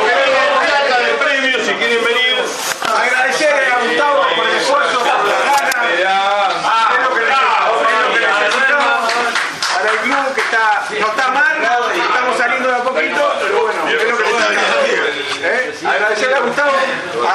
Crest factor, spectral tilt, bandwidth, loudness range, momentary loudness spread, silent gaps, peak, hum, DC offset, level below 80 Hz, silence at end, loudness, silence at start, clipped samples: 14 dB; -1 dB/octave; 13.5 kHz; 2 LU; 4 LU; none; 0 dBFS; none; under 0.1%; -66 dBFS; 0 s; -13 LUFS; 0 s; under 0.1%